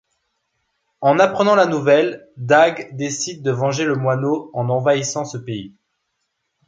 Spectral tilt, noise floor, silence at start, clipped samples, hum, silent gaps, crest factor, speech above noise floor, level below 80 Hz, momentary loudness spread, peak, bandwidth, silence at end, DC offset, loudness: -5 dB/octave; -73 dBFS; 1 s; under 0.1%; none; none; 18 dB; 56 dB; -62 dBFS; 12 LU; -2 dBFS; 9.2 kHz; 1 s; under 0.1%; -18 LUFS